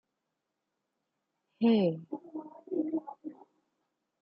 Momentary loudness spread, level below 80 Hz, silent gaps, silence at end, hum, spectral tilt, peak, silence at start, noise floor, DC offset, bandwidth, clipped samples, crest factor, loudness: 20 LU; -84 dBFS; none; 0.9 s; none; -10 dB/octave; -16 dBFS; 1.6 s; -85 dBFS; under 0.1%; 5.4 kHz; under 0.1%; 18 dB; -32 LUFS